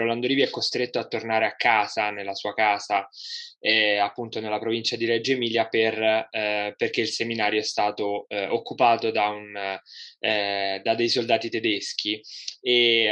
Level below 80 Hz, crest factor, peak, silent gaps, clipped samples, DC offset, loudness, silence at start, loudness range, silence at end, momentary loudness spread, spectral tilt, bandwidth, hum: -80 dBFS; 20 dB; -4 dBFS; none; under 0.1%; under 0.1%; -24 LUFS; 0 s; 2 LU; 0 s; 10 LU; -3.5 dB/octave; 9.8 kHz; none